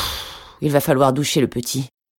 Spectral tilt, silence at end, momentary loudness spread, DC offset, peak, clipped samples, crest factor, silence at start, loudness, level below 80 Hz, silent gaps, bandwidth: -5 dB/octave; 0.3 s; 11 LU; under 0.1%; -2 dBFS; under 0.1%; 18 dB; 0 s; -19 LUFS; -44 dBFS; none; 17.5 kHz